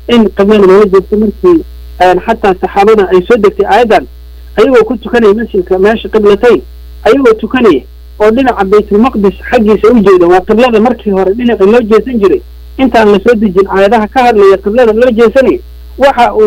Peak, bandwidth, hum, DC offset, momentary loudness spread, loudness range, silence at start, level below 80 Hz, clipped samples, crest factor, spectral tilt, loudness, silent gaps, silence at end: 0 dBFS; 16 kHz; none; under 0.1%; 5 LU; 1 LU; 0 s; -30 dBFS; 0.5%; 6 dB; -6.5 dB/octave; -7 LUFS; none; 0 s